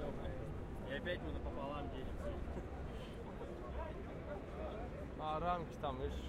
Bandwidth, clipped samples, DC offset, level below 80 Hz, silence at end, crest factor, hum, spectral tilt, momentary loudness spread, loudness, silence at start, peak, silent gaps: 13.5 kHz; under 0.1%; under 0.1%; -50 dBFS; 0 s; 18 dB; none; -7 dB/octave; 8 LU; -45 LUFS; 0 s; -26 dBFS; none